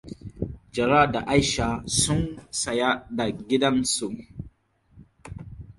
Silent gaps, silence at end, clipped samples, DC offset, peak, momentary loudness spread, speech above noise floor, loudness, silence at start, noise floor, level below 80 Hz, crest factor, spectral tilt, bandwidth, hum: none; 0.05 s; under 0.1%; under 0.1%; -4 dBFS; 21 LU; 35 dB; -24 LUFS; 0.05 s; -59 dBFS; -44 dBFS; 22 dB; -4 dB/octave; 11.5 kHz; none